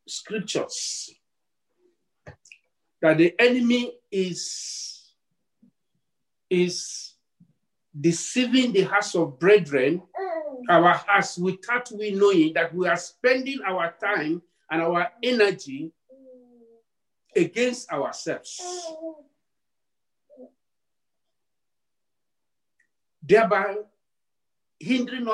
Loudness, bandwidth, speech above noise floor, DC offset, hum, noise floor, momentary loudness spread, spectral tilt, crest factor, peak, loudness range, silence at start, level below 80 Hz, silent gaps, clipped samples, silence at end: -23 LUFS; 11.5 kHz; 65 dB; under 0.1%; none; -88 dBFS; 15 LU; -4 dB/octave; 20 dB; -6 dBFS; 10 LU; 0.1 s; -74 dBFS; none; under 0.1%; 0 s